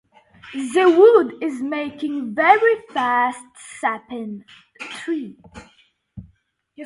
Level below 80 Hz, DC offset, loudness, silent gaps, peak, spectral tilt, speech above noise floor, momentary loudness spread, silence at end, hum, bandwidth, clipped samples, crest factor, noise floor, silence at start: -60 dBFS; under 0.1%; -18 LUFS; none; 0 dBFS; -4.5 dB/octave; 42 dB; 21 LU; 0 s; none; 11.5 kHz; under 0.1%; 20 dB; -61 dBFS; 0.45 s